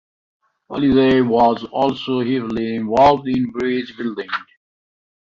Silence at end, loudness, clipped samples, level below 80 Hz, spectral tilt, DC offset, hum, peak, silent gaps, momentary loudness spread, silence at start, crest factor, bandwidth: 0.8 s; -18 LUFS; under 0.1%; -48 dBFS; -7.5 dB/octave; under 0.1%; none; -2 dBFS; none; 12 LU; 0.7 s; 16 dB; 7.2 kHz